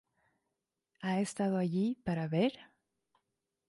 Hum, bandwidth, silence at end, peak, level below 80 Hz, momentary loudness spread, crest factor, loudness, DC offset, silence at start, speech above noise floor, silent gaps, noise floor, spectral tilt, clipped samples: none; 11.5 kHz; 1.05 s; -20 dBFS; -70 dBFS; 4 LU; 16 dB; -34 LUFS; under 0.1%; 1 s; 54 dB; none; -87 dBFS; -6.5 dB/octave; under 0.1%